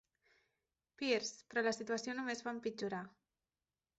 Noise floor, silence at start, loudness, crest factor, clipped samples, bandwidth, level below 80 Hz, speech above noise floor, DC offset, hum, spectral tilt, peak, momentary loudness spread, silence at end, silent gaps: under -90 dBFS; 1 s; -40 LUFS; 20 dB; under 0.1%; 8 kHz; -82 dBFS; over 50 dB; under 0.1%; none; -2 dB/octave; -22 dBFS; 7 LU; 0.9 s; none